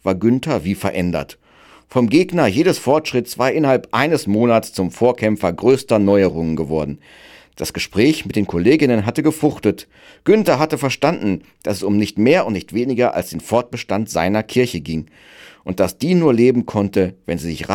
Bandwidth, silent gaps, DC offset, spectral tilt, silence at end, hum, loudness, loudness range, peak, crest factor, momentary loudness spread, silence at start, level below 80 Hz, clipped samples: 17.5 kHz; none; under 0.1%; -6 dB/octave; 0 s; none; -17 LUFS; 2 LU; -2 dBFS; 16 dB; 10 LU; 0.05 s; -50 dBFS; under 0.1%